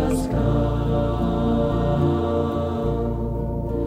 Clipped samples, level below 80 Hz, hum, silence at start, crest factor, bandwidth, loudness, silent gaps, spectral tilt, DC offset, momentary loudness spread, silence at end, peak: under 0.1%; -30 dBFS; none; 0 s; 12 dB; 15 kHz; -23 LUFS; none; -8.5 dB/octave; under 0.1%; 5 LU; 0 s; -8 dBFS